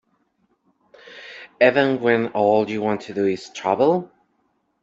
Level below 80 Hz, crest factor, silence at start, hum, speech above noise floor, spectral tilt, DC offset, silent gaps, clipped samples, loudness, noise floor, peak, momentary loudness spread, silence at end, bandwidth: -66 dBFS; 20 dB; 1.1 s; none; 49 dB; -6 dB/octave; under 0.1%; none; under 0.1%; -20 LUFS; -68 dBFS; -2 dBFS; 21 LU; 0.75 s; 8 kHz